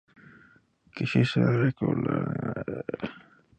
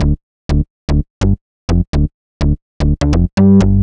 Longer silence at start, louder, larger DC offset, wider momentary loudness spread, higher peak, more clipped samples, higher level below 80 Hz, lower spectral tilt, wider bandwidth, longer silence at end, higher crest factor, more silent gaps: first, 0.95 s vs 0 s; second, -27 LUFS vs -16 LUFS; neither; first, 13 LU vs 10 LU; second, -10 dBFS vs 0 dBFS; neither; second, -60 dBFS vs -18 dBFS; about the same, -8 dB/octave vs -8 dB/octave; about the same, 8.6 kHz vs 9.4 kHz; first, 0.4 s vs 0 s; first, 18 dB vs 12 dB; second, none vs 0.23-0.49 s, 0.70-0.88 s, 1.10-1.21 s, 1.41-1.68 s, 1.87-1.93 s, 2.14-2.40 s, 2.62-2.80 s, 3.33-3.37 s